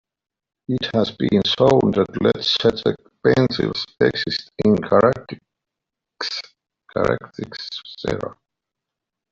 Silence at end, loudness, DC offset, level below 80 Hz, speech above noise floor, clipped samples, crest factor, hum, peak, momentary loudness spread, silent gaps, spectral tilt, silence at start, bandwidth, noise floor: 1 s; -20 LUFS; under 0.1%; -50 dBFS; 65 dB; under 0.1%; 18 dB; none; -2 dBFS; 15 LU; none; -6 dB/octave; 0.7 s; 7.6 kHz; -84 dBFS